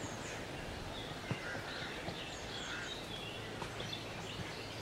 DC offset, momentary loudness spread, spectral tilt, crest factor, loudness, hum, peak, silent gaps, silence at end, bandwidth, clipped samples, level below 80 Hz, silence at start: under 0.1%; 3 LU; -3.5 dB/octave; 20 dB; -43 LUFS; none; -24 dBFS; none; 0 s; 16 kHz; under 0.1%; -58 dBFS; 0 s